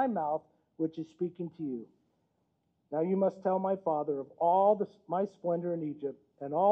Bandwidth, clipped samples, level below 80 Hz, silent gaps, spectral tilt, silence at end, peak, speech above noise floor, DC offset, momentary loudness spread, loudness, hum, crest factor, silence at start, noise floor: 6.2 kHz; under 0.1%; -82 dBFS; none; -10 dB/octave; 0 s; -14 dBFS; 46 dB; under 0.1%; 12 LU; -32 LUFS; none; 18 dB; 0 s; -77 dBFS